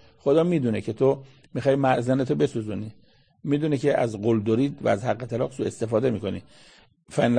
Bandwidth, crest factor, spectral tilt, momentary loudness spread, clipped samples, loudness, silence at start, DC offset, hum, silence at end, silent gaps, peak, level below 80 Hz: 9.8 kHz; 18 dB; -7.5 dB/octave; 11 LU; under 0.1%; -24 LUFS; 0.25 s; 0.1%; none; 0 s; none; -6 dBFS; -60 dBFS